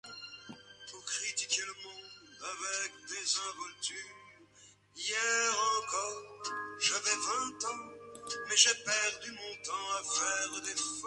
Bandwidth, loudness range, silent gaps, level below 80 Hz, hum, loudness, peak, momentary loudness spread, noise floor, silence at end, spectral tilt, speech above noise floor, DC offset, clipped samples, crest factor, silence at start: 11.5 kHz; 7 LU; none; -78 dBFS; 50 Hz at -70 dBFS; -33 LUFS; -8 dBFS; 18 LU; -62 dBFS; 0 s; 1.5 dB/octave; 27 dB; under 0.1%; under 0.1%; 28 dB; 0.05 s